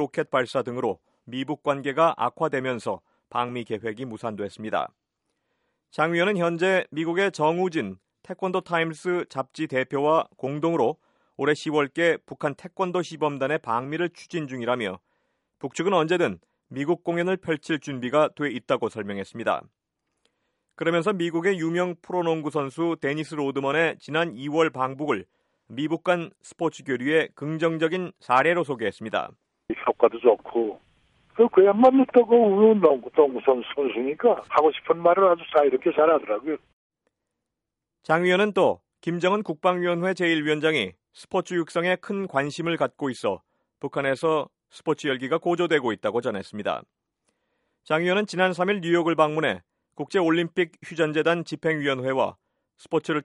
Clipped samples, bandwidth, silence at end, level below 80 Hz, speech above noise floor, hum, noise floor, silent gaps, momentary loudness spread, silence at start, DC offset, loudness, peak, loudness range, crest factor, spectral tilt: under 0.1%; 11.5 kHz; 0 s; -70 dBFS; 61 dB; none; -85 dBFS; 36.73-36.90 s; 11 LU; 0 s; under 0.1%; -24 LUFS; -4 dBFS; 7 LU; 20 dB; -6 dB/octave